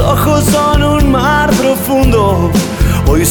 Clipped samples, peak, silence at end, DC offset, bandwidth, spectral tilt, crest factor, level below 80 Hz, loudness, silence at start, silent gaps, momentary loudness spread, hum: under 0.1%; 0 dBFS; 0 s; under 0.1%; over 20 kHz; -5.5 dB/octave; 8 dB; -18 dBFS; -11 LUFS; 0 s; none; 3 LU; none